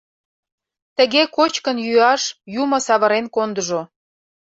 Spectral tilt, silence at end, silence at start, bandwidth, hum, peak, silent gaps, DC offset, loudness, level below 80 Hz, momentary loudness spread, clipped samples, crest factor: -2.5 dB/octave; 0.75 s; 1 s; 8.2 kHz; none; -2 dBFS; none; under 0.1%; -18 LUFS; -66 dBFS; 9 LU; under 0.1%; 16 dB